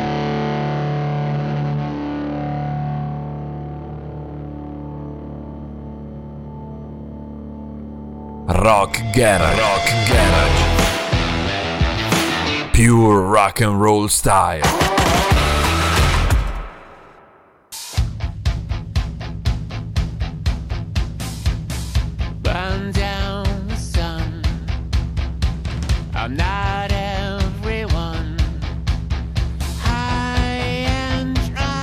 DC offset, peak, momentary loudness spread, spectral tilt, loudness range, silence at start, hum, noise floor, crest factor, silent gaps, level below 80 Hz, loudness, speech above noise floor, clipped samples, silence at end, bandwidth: under 0.1%; -4 dBFS; 18 LU; -5 dB/octave; 13 LU; 0 s; none; -49 dBFS; 16 dB; none; -26 dBFS; -19 LUFS; 35 dB; under 0.1%; 0 s; 17.5 kHz